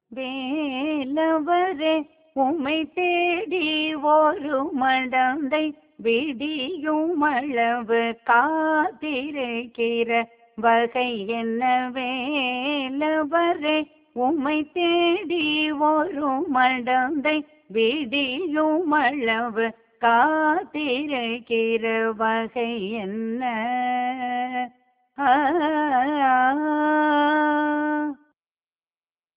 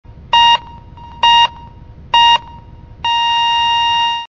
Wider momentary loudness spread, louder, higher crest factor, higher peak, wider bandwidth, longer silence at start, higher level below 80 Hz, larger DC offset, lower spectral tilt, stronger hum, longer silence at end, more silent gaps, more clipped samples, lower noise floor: about the same, 7 LU vs 6 LU; second, -23 LUFS vs -12 LUFS; about the same, 16 dB vs 14 dB; second, -6 dBFS vs 0 dBFS; second, 4 kHz vs 7.6 kHz; about the same, 0.1 s vs 0.1 s; second, -66 dBFS vs -40 dBFS; second, under 0.1% vs 0.3%; first, -7.5 dB/octave vs -1 dB/octave; neither; first, 1.2 s vs 0.05 s; neither; neither; first, under -90 dBFS vs -36 dBFS